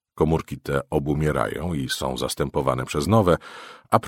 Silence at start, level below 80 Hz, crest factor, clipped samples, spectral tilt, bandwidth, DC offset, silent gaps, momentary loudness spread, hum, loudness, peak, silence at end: 0.15 s; -40 dBFS; 22 dB; under 0.1%; -6 dB/octave; 16.5 kHz; under 0.1%; none; 8 LU; none; -24 LUFS; 0 dBFS; 0 s